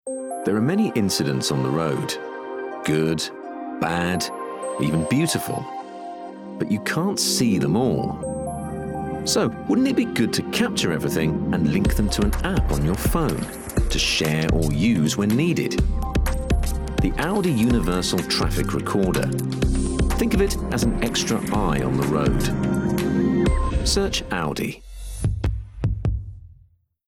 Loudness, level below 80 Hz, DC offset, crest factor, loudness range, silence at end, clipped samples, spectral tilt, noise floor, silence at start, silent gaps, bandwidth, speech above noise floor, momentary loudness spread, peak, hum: -23 LUFS; -30 dBFS; under 0.1%; 12 dB; 3 LU; 0.55 s; under 0.1%; -5 dB/octave; -57 dBFS; 0.05 s; none; 17.5 kHz; 35 dB; 9 LU; -10 dBFS; none